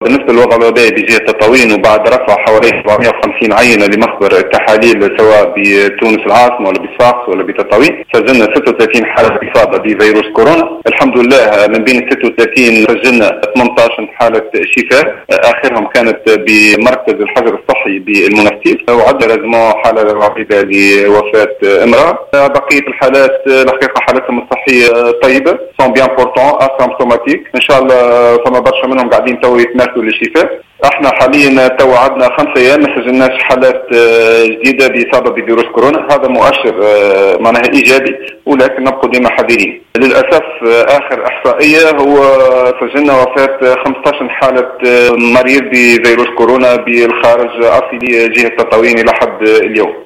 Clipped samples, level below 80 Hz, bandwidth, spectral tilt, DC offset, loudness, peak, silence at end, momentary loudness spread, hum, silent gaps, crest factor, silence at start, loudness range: 1%; -42 dBFS; 16 kHz; -4.5 dB/octave; under 0.1%; -7 LUFS; 0 dBFS; 0 s; 5 LU; none; none; 8 dB; 0 s; 1 LU